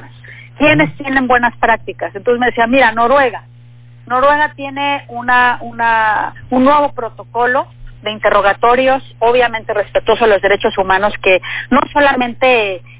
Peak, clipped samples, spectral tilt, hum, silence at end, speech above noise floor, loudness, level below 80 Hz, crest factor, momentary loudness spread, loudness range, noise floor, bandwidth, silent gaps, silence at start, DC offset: 0 dBFS; under 0.1%; -8.5 dB/octave; 60 Hz at -40 dBFS; 0.05 s; 26 dB; -13 LUFS; -40 dBFS; 14 dB; 8 LU; 2 LU; -39 dBFS; 4 kHz; none; 0 s; under 0.1%